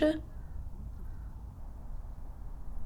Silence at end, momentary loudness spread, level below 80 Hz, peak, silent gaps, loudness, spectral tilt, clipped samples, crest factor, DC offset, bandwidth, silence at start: 0 s; 8 LU; -42 dBFS; -16 dBFS; none; -43 LUFS; -7.5 dB/octave; under 0.1%; 22 dB; under 0.1%; 14 kHz; 0 s